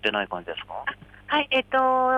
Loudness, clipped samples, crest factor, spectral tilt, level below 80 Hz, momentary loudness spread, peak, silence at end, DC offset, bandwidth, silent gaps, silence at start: -25 LUFS; under 0.1%; 16 dB; -5 dB/octave; -58 dBFS; 12 LU; -10 dBFS; 0 s; under 0.1%; 8.8 kHz; none; 0.05 s